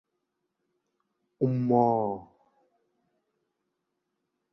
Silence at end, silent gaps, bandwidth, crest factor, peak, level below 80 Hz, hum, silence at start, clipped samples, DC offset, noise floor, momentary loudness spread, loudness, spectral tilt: 2.3 s; none; 5.8 kHz; 24 dB; -10 dBFS; -72 dBFS; none; 1.4 s; under 0.1%; under 0.1%; -82 dBFS; 10 LU; -27 LUFS; -12 dB/octave